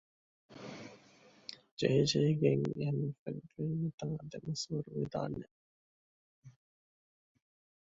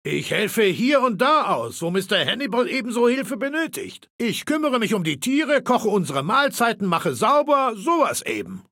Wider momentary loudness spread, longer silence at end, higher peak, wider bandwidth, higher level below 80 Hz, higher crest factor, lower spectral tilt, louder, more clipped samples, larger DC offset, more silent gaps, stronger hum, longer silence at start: first, 20 LU vs 8 LU; first, 1.3 s vs 0.1 s; second, -16 dBFS vs -6 dBFS; second, 7.8 kHz vs 17 kHz; about the same, -68 dBFS vs -68 dBFS; first, 22 dB vs 16 dB; first, -6 dB/octave vs -4.5 dB/octave; second, -35 LUFS vs -21 LUFS; neither; neither; first, 1.71-1.77 s, 3.19-3.26 s, 3.94-3.98 s, 5.51-6.42 s vs 4.10-4.19 s; neither; first, 0.5 s vs 0.05 s